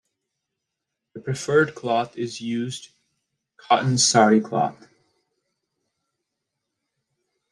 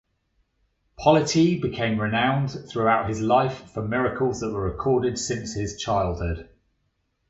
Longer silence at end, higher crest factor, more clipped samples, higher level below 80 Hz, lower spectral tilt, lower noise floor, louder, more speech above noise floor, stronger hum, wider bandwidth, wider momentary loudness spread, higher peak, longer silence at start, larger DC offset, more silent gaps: first, 2.8 s vs 0.85 s; about the same, 22 dB vs 20 dB; neither; second, -68 dBFS vs -44 dBFS; second, -4 dB/octave vs -5.5 dB/octave; first, -83 dBFS vs -72 dBFS; first, -21 LUFS vs -24 LUFS; first, 61 dB vs 49 dB; neither; first, 12 kHz vs 8.2 kHz; first, 14 LU vs 9 LU; about the same, -4 dBFS vs -4 dBFS; first, 1.15 s vs 1 s; neither; neither